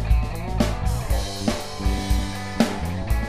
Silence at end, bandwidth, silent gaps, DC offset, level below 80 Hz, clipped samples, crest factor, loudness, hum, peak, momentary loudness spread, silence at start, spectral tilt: 0 s; 15.5 kHz; none; 1%; -26 dBFS; under 0.1%; 18 dB; -25 LUFS; none; -6 dBFS; 4 LU; 0 s; -5.5 dB/octave